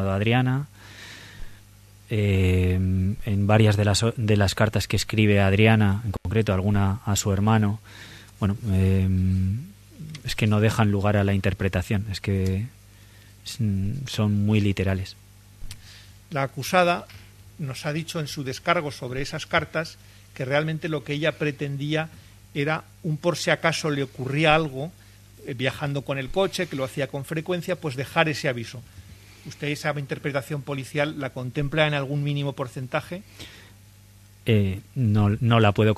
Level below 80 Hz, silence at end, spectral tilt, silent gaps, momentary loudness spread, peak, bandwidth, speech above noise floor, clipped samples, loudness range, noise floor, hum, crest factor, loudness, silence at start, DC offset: -46 dBFS; 0 s; -6 dB/octave; none; 17 LU; -2 dBFS; 14 kHz; 27 dB; under 0.1%; 6 LU; -50 dBFS; 50 Hz at -45 dBFS; 22 dB; -24 LUFS; 0 s; under 0.1%